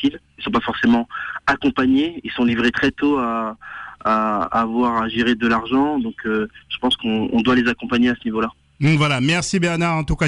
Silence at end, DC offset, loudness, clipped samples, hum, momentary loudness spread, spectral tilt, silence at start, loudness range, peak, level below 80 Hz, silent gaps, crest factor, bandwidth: 0 s; under 0.1%; -19 LUFS; under 0.1%; none; 7 LU; -5.5 dB/octave; 0 s; 1 LU; -8 dBFS; -42 dBFS; none; 10 dB; 11 kHz